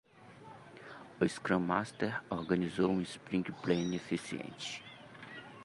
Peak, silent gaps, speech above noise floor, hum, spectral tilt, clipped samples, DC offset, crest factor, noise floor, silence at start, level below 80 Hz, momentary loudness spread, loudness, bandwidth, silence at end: -14 dBFS; none; 20 dB; none; -6 dB/octave; under 0.1%; under 0.1%; 22 dB; -55 dBFS; 0.15 s; -66 dBFS; 19 LU; -35 LUFS; 11.5 kHz; 0 s